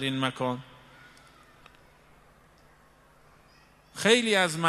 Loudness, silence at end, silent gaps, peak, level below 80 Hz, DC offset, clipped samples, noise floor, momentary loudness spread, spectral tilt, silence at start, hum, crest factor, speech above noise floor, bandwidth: -26 LUFS; 0 s; none; -4 dBFS; -66 dBFS; under 0.1%; under 0.1%; -59 dBFS; 22 LU; -3.5 dB/octave; 0 s; none; 26 dB; 33 dB; 14.5 kHz